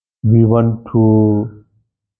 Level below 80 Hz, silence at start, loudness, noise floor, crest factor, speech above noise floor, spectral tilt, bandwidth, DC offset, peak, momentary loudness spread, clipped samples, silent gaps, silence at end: -44 dBFS; 0.25 s; -13 LUFS; -63 dBFS; 14 dB; 51 dB; -14.5 dB/octave; 3.1 kHz; under 0.1%; 0 dBFS; 7 LU; under 0.1%; none; 0.7 s